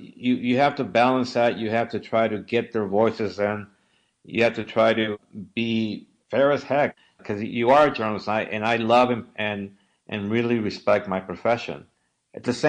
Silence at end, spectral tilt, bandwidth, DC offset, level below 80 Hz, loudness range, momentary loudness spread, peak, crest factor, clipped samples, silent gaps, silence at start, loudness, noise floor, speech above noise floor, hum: 0 s; -6 dB/octave; 9.6 kHz; under 0.1%; -64 dBFS; 3 LU; 12 LU; -8 dBFS; 16 dB; under 0.1%; none; 0 s; -23 LUFS; -66 dBFS; 43 dB; none